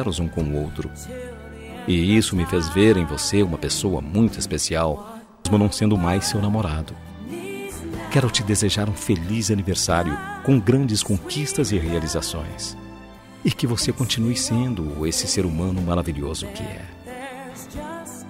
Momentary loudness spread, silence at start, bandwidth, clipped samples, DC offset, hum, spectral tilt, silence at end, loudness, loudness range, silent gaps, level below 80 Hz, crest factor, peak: 16 LU; 0 s; 16 kHz; under 0.1%; under 0.1%; none; -5 dB/octave; 0 s; -22 LUFS; 4 LU; none; -40 dBFS; 18 dB; -6 dBFS